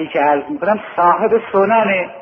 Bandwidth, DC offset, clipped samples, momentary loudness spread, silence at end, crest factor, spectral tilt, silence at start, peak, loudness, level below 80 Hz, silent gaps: 5.8 kHz; under 0.1%; under 0.1%; 5 LU; 0 s; 14 dB; -8.5 dB/octave; 0 s; -2 dBFS; -15 LUFS; -56 dBFS; none